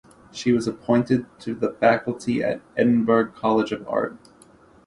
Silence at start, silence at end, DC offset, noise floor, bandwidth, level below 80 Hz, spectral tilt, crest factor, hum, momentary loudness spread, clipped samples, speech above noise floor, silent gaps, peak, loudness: 0.35 s; 0.7 s; under 0.1%; -52 dBFS; 11 kHz; -58 dBFS; -6.5 dB/octave; 18 dB; none; 8 LU; under 0.1%; 30 dB; none; -4 dBFS; -23 LUFS